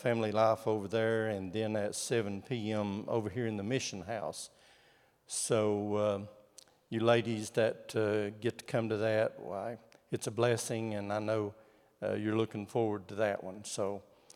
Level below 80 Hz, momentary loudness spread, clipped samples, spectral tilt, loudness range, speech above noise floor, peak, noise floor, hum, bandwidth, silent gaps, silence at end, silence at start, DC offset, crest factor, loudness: -80 dBFS; 11 LU; under 0.1%; -5 dB/octave; 3 LU; 33 dB; -14 dBFS; -67 dBFS; none; 16 kHz; none; 0.35 s; 0 s; under 0.1%; 20 dB; -34 LUFS